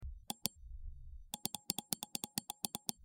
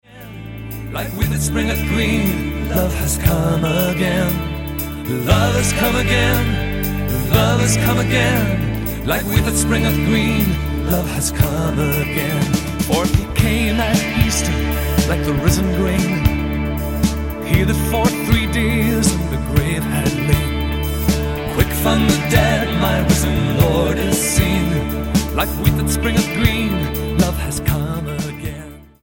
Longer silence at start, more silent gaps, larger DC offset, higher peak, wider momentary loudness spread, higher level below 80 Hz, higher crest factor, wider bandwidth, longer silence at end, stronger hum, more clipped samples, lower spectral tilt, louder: about the same, 0 s vs 0.1 s; neither; neither; second, -12 dBFS vs 0 dBFS; first, 15 LU vs 6 LU; second, -54 dBFS vs -24 dBFS; first, 34 dB vs 16 dB; first, over 20 kHz vs 17 kHz; second, 0 s vs 0.2 s; neither; neither; second, -2 dB/octave vs -5 dB/octave; second, -42 LUFS vs -17 LUFS